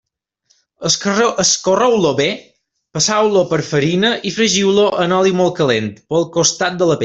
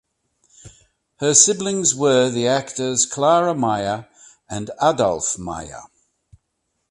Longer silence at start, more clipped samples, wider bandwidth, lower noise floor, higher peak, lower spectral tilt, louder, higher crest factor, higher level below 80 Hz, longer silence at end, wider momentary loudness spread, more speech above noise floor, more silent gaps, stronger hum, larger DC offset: first, 0.8 s vs 0.65 s; neither; second, 8.4 kHz vs 11.5 kHz; second, -62 dBFS vs -74 dBFS; about the same, 0 dBFS vs 0 dBFS; about the same, -3.5 dB/octave vs -3 dB/octave; first, -15 LUFS vs -18 LUFS; about the same, 16 dB vs 20 dB; about the same, -54 dBFS vs -54 dBFS; second, 0 s vs 1.05 s; second, 6 LU vs 17 LU; second, 47 dB vs 55 dB; neither; neither; neither